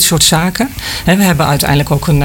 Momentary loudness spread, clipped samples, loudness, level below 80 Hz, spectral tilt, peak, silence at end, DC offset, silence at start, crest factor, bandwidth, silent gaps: 8 LU; under 0.1%; -11 LUFS; -28 dBFS; -4 dB/octave; 0 dBFS; 0 s; under 0.1%; 0 s; 10 dB; 17 kHz; none